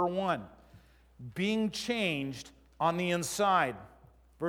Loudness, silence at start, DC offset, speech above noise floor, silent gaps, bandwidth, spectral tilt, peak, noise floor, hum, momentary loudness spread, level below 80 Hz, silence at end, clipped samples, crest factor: -31 LUFS; 0 s; under 0.1%; 28 dB; none; 18 kHz; -4.5 dB/octave; -14 dBFS; -59 dBFS; none; 20 LU; -62 dBFS; 0 s; under 0.1%; 20 dB